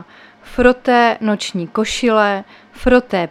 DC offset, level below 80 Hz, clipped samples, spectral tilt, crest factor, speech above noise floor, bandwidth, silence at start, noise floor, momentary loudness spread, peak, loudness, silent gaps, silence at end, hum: under 0.1%; -36 dBFS; under 0.1%; -4.5 dB/octave; 16 dB; 26 dB; 12.5 kHz; 0 s; -41 dBFS; 8 LU; 0 dBFS; -15 LUFS; none; 0 s; none